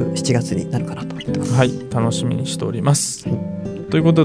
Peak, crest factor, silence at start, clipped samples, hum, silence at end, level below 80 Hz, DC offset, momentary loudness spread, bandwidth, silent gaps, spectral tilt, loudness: -2 dBFS; 16 dB; 0 s; under 0.1%; none; 0 s; -50 dBFS; under 0.1%; 8 LU; 11 kHz; none; -5.5 dB/octave; -20 LUFS